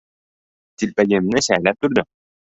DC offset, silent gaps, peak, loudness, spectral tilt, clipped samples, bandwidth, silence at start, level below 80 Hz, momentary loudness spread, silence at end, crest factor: under 0.1%; none; 0 dBFS; -18 LUFS; -4.5 dB/octave; under 0.1%; 8.4 kHz; 0.8 s; -54 dBFS; 8 LU; 0.4 s; 20 dB